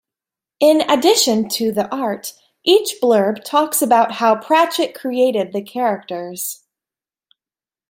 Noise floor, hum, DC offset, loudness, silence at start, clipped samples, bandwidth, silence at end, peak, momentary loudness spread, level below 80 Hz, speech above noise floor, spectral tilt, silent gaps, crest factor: under -90 dBFS; none; under 0.1%; -17 LUFS; 0.6 s; under 0.1%; 16.5 kHz; 1.35 s; 0 dBFS; 12 LU; -66 dBFS; over 74 dB; -3 dB/octave; none; 16 dB